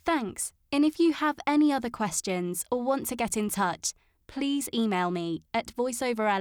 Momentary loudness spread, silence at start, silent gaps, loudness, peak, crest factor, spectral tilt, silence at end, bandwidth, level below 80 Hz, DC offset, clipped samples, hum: 8 LU; 0.05 s; none; -28 LUFS; -14 dBFS; 14 dB; -4 dB/octave; 0 s; over 20 kHz; -60 dBFS; under 0.1%; under 0.1%; none